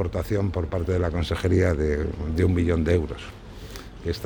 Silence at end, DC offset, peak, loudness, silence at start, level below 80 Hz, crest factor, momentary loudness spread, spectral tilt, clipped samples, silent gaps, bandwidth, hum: 0 s; under 0.1%; -8 dBFS; -25 LUFS; 0 s; -34 dBFS; 16 dB; 18 LU; -7.5 dB/octave; under 0.1%; none; 19.5 kHz; none